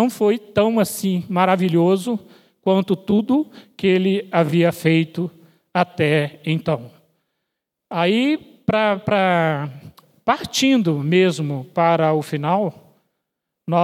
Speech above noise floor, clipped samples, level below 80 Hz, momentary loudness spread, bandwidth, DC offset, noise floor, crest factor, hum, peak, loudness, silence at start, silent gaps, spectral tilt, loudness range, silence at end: 61 dB; under 0.1%; -60 dBFS; 9 LU; 16 kHz; under 0.1%; -79 dBFS; 18 dB; none; 0 dBFS; -19 LUFS; 0 s; none; -6 dB/octave; 3 LU; 0 s